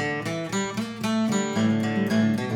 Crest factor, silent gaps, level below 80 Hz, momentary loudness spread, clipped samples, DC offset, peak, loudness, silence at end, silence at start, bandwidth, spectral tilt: 12 dB; none; -62 dBFS; 6 LU; under 0.1%; under 0.1%; -12 dBFS; -25 LUFS; 0 s; 0 s; 15.5 kHz; -5.5 dB/octave